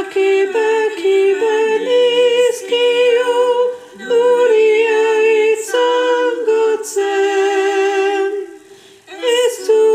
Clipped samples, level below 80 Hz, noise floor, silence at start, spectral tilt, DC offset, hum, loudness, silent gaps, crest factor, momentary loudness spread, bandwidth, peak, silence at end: under 0.1%; -72 dBFS; -42 dBFS; 0 s; -1.5 dB/octave; under 0.1%; none; -14 LUFS; none; 10 dB; 6 LU; 15 kHz; -4 dBFS; 0 s